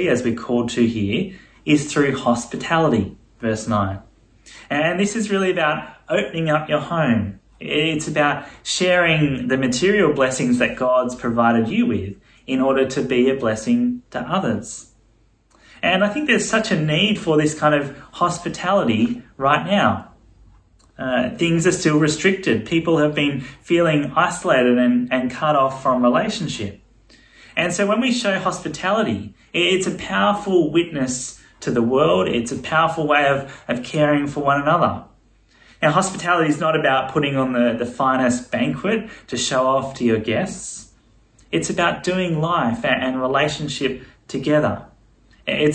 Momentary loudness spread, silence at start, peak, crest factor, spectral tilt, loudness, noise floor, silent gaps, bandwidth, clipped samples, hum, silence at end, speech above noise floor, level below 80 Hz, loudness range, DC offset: 9 LU; 0 s; -2 dBFS; 18 dB; -5 dB/octave; -19 LUFS; -57 dBFS; none; 10 kHz; under 0.1%; none; 0 s; 38 dB; -52 dBFS; 3 LU; under 0.1%